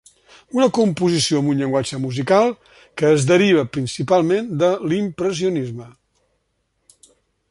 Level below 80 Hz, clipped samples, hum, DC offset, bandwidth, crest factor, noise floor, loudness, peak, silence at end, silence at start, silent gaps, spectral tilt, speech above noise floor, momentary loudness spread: -58 dBFS; under 0.1%; none; under 0.1%; 11.5 kHz; 18 dB; -69 dBFS; -18 LUFS; -2 dBFS; 1.6 s; 0.55 s; none; -5.5 dB/octave; 51 dB; 11 LU